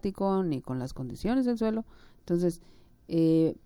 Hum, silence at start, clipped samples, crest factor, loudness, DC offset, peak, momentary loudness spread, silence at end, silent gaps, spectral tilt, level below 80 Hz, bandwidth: none; 0.05 s; under 0.1%; 14 dB; -29 LUFS; under 0.1%; -16 dBFS; 11 LU; 0.1 s; none; -8 dB/octave; -52 dBFS; 16 kHz